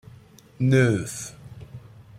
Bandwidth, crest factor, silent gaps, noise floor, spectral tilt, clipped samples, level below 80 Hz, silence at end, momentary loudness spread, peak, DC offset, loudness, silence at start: 14.5 kHz; 18 dB; none; -50 dBFS; -6.5 dB/octave; under 0.1%; -54 dBFS; 0.4 s; 24 LU; -8 dBFS; under 0.1%; -23 LUFS; 0.6 s